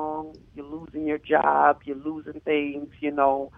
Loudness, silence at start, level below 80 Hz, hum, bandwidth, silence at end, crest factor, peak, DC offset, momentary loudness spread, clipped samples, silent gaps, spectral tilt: -25 LUFS; 0 s; -58 dBFS; none; 5.4 kHz; 0.1 s; 20 dB; -4 dBFS; under 0.1%; 18 LU; under 0.1%; none; -8 dB/octave